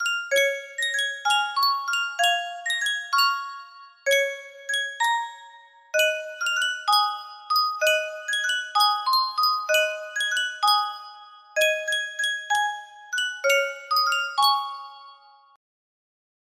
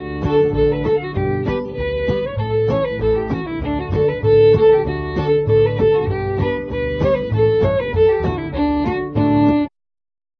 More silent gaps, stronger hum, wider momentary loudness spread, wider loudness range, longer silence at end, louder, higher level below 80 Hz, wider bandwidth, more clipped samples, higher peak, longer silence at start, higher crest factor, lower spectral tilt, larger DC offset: neither; neither; about the same, 10 LU vs 8 LU; about the same, 3 LU vs 4 LU; first, 1.4 s vs 0.7 s; second, -23 LUFS vs -17 LUFS; second, -78 dBFS vs -32 dBFS; first, 16 kHz vs 5.4 kHz; neither; second, -6 dBFS vs -2 dBFS; about the same, 0 s vs 0 s; about the same, 18 dB vs 14 dB; second, 3.5 dB/octave vs -9.5 dB/octave; neither